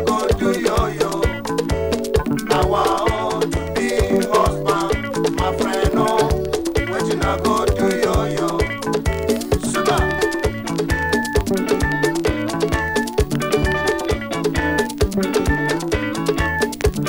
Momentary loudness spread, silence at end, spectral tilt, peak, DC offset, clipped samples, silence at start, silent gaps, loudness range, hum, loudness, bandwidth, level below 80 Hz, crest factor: 4 LU; 0 s; -5 dB/octave; -6 dBFS; under 0.1%; under 0.1%; 0 s; none; 1 LU; none; -19 LUFS; 18 kHz; -28 dBFS; 12 dB